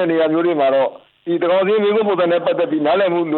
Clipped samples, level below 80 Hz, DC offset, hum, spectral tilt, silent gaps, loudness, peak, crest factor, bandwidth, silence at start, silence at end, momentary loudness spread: under 0.1%; -64 dBFS; under 0.1%; none; -10 dB/octave; none; -17 LUFS; -6 dBFS; 10 dB; 4.3 kHz; 0 s; 0 s; 5 LU